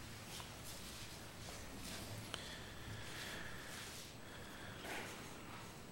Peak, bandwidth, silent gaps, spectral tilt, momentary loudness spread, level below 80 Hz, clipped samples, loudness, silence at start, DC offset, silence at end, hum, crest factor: -22 dBFS; 16.5 kHz; none; -3 dB/octave; 5 LU; -64 dBFS; under 0.1%; -50 LUFS; 0 s; under 0.1%; 0 s; none; 30 dB